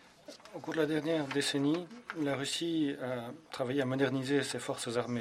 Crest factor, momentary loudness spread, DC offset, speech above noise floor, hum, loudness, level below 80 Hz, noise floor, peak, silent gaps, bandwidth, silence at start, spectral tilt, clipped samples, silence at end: 16 dB; 13 LU; under 0.1%; 20 dB; none; -34 LUFS; -76 dBFS; -54 dBFS; -18 dBFS; none; 15 kHz; 0.3 s; -4.5 dB/octave; under 0.1%; 0 s